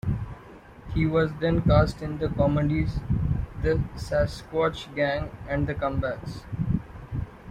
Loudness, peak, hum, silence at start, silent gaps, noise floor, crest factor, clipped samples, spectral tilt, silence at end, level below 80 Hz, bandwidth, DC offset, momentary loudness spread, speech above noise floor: -27 LUFS; -6 dBFS; none; 0.05 s; none; -47 dBFS; 20 dB; under 0.1%; -8 dB/octave; 0 s; -36 dBFS; 11.5 kHz; under 0.1%; 13 LU; 22 dB